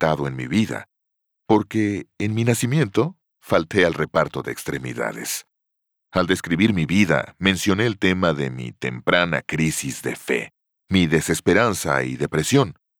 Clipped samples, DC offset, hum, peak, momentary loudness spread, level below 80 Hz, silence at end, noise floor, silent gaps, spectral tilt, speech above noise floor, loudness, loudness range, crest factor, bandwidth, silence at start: under 0.1%; under 0.1%; none; -4 dBFS; 9 LU; -50 dBFS; 0.25 s; -78 dBFS; none; -5 dB/octave; 58 dB; -21 LUFS; 3 LU; 18 dB; over 20 kHz; 0 s